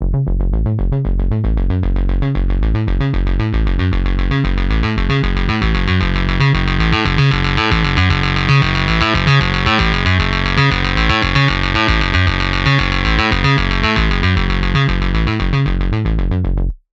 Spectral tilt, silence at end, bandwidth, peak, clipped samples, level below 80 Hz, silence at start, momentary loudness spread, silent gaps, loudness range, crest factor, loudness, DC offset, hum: -6.5 dB/octave; 0.15 s; 7.6 kHz; 0 dBFS; under 0.1%; -18 dBFS; 0 s; 5 LU; none; 4 LU; 14 dB; -15 LUFS; 0.2%; none